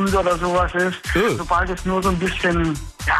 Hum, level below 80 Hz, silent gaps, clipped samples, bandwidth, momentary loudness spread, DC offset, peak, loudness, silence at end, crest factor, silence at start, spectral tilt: none; -32 dBFS; none; under 0.1%; 14 kHz; 3 LU; under 0.1%; -8 dBFS; -20 LUFS; 0 s; 12 dB; 0 s; -5 dB/octave